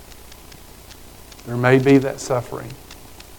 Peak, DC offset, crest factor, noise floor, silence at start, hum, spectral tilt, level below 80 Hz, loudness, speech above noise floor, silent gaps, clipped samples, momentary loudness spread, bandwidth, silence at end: 0 dBFS; under 0.1%; 22 dB; -42 dBFS; 0.1 s; none; -6.5 dB/octave; -48 dBFS; -18 LUFS; 24 dB; none; under 0.1%; 27 LU; 19 kHz; 0.05 s